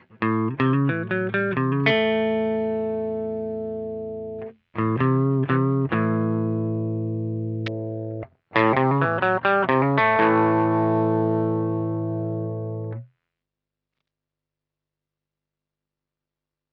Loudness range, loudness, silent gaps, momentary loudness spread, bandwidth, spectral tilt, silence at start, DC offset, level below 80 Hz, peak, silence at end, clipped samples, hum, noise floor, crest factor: 10 LU; -23 LUFS; none; 12 LU; 5.6 kHz; -9.5 dB/octave; 0.2 s; under 0.1%; -60 dBFS; -4 dBFS; 3.7 s; under 0.1%; 50 Hz at -65 dBFS; -87 dBFS; 20 dB